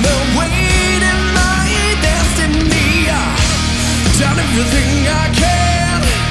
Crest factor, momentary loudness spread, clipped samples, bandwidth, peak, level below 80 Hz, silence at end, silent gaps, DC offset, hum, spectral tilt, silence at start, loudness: 12 dB; 2 LU; under 0.1%; 12 kHz; 0 dBFS; -20 dBFS; 0 s; none; under 0.1%; none; -4 dB/octave; 0 s; -13 LUFS